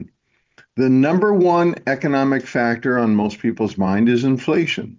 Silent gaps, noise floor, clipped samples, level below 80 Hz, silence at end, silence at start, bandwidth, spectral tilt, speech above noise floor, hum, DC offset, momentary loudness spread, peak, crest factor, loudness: none; -64 dBFS; under 0.1%; -54 dBFS; 0.05 s; 0 s; 7.6 kHz; -7 dB/octave; 47 dB; none; under 0.1%; 6 LU; -6 dBFS; 12 dB; -18 LUFS